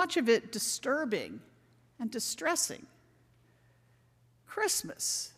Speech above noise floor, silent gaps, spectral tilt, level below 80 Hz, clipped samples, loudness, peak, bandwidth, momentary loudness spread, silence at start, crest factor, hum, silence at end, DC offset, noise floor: 34 dB; none; -1.5 dB/octave; -76 dBFS; under 0.1%; -32 LUFS; -14 dBFS; 16 kHz; 14 LU; 0 s; 20 dB; none; 0.05 s; under 0.1%; -66 dBFS